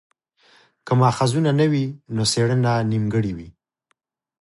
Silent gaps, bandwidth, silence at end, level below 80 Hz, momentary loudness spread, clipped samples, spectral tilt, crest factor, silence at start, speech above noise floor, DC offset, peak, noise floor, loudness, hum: none; 11.5 kHz; 0.9 s; -52 dBFS; 7 LU; under 0.1%; -6 dB/octave; 18 dB; 0.85 s; 52 dB; under 0.1%; -4 dBFS; -72 dBFS; -20 LUFS; none